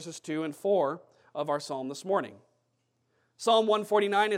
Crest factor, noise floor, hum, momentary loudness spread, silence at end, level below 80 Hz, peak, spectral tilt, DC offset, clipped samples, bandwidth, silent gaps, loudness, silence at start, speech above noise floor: 18 dB; -76 dBFS; none; 12 LU; 0 s; under -90 dBFS; -12 dBFS; -4 dB/octave; under 0.1%; under 0.1%; 15.5 kHz; none; -29 LUFS; 0 s; 47 dB